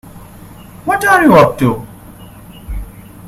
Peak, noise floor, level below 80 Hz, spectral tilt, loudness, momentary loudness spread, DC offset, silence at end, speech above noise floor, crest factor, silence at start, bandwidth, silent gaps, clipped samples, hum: 0 dBFS; -35 dBFS; -34 dBFS; -6 dB/octave; -10 LUFS; 23 LU; under 0.1%; 0 s; 26 dB; 14 dB; 0.05 s; 16 kHz; none; 0.2%; none